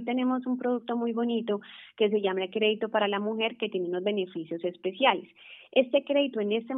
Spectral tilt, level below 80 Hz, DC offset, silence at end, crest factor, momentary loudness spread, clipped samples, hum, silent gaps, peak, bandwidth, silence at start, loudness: -9 dB/octave; -88 dBFS; under 0.1%; 0 s; 20 dB; 9 LU; under 0.1%; none; none; -8 dBFS; 4 kHz; 0 s; -28 LUFS